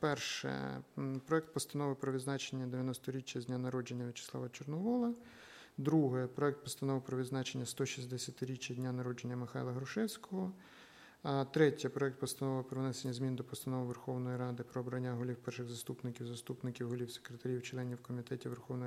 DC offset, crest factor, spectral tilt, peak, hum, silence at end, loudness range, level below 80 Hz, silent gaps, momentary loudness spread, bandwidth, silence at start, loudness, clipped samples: under 0.1%; 22 dB; -5.5 dB/octave; -18 dBFS; none; 0 s; 5 LU; -78 dBFS; none; 8 LU; 16 kHz; 0 s; -40 LUFS; under 0.1%